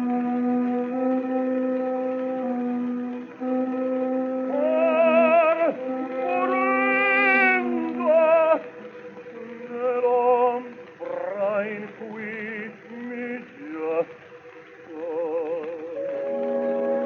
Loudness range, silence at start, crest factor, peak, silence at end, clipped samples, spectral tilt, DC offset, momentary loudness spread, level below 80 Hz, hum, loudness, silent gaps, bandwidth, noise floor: 11 LU; 0 s; 16 dB; -8 dBFS; 0 s; under 0.1%; -7 dB/octave; under 0.1%; 18 LU; -80 dBFS; none; -23 LUFS; none; 6.2 kHz; -45 dBFS